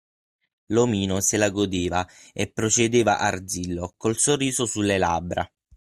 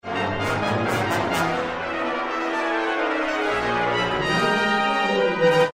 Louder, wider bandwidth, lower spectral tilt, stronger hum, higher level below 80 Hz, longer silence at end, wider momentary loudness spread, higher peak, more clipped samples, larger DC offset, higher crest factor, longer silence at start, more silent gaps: about the same, -23 LUFS vs -22 LUFS; about the same, 15.5 kHz vs 16 kHz; about the same, -4 dB/octave vs -5 dB/octave; neither; about the same, -54 dBFS vs -50 dBFS; first, 0.35 s vs 0 s; first, 10 LU vs 5 LU; about the same, -6 dBFS vs -6 dBFS; neither; neither; about the same, 18 dB vs 16 dB; first, 0.7 s vs 0.05 s; neither